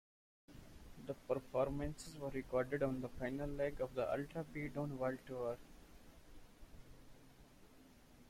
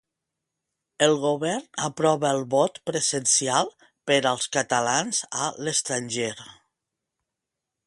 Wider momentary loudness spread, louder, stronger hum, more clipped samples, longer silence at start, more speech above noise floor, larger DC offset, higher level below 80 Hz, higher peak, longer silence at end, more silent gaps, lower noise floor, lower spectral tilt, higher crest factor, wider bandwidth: first, 24 LU vs 8 LU; second, -43 LUFS vs -24 LUFS; neither; neither; second, 0.5 s vs 1 s; second, 22 dB vs 61 dB; neither; first, -60 dBFS vs -70 dBFS; second, -26 dBFS vs -4 dBFS; second, 0 s vs 1.35 s; neither; second, -63 dBFS vs -85 dBFS; first, -7 dB/octave vs -2.5 dB/octave; about the same, 18 dB vs 22 dB; first, 16.5 kHz vs 11.5 kHz